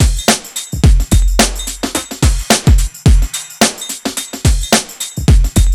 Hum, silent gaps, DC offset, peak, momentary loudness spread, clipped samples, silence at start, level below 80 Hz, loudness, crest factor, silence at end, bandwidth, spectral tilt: none; none; under 0.1%; 0 dBFS; 9 LU; under 0.1%; 0 s; -14 dBFS; -14 LUFS; 12 dB; 0 s; 18.5 kHz; -4 dB/octave